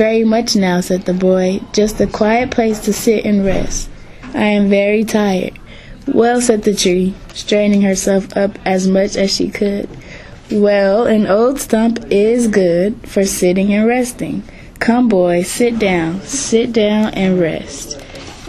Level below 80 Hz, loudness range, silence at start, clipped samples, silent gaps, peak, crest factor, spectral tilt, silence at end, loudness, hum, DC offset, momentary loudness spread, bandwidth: -36 dBFS; 2 LU; 0 s; under 0.1%; none; 0 dBFS; 14 dB; -5 dB/octave; 0 s; -14 LUFS; none; under 0.1%; 11 LU; 13.5 kHz